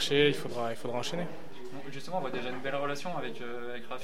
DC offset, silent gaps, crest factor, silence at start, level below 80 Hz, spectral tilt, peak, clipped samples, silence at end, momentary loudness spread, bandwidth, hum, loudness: 2%; none; 22 dB; 0 s; -62 dBFS; -4.5 dB/octave; -10 dBFS; under 0.1%; 0 s; 15 LU; 16 kHz; none; -34 LUFS